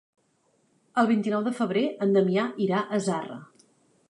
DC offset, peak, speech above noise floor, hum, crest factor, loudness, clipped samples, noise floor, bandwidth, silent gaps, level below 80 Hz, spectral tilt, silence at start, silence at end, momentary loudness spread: under 0.1%; -8 dBFS; 43 dB; none; 18 dB; -26 LUFS; under 0.1%; -68 dBFS; 11.5 kHz; none; -78 dBFS; -6.5 dB/octave; 0.95 s; 0.65 s; 8 LU